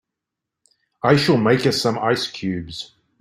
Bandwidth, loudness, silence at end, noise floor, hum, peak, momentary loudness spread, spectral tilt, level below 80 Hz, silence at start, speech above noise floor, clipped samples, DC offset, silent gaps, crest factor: 16 kHz; -19 LUFS; 0.35 s; -84 dBFS; none; -2 dBFS; 16 LU; -5.5 dB/octave; -54 dBFS; 1.05 s; 65 dB; under 0.1%; under 0.1%; none; 20 dB